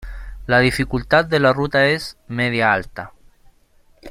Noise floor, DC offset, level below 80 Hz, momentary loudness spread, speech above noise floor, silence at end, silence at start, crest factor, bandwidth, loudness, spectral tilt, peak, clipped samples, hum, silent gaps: -54 dBFS; under 0.1%; -38 dBFS; 19 LU; 36 dB; 0 s; 0 s; 18 dB; 16 kHz; -18 LUFS; -5.5 dB/octave; -2 dBFS; under 0.1%; none; none